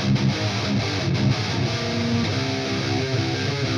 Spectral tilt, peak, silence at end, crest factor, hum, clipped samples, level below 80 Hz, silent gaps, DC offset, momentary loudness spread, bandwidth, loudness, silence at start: -5.5 dB/octave; -10 dBFS; 0 s; 14 dB; none; under 0.1%; -46 dBFS; none; under 0.1%; 2 LU; 10.5 kHz; -23 LUFS; 0 s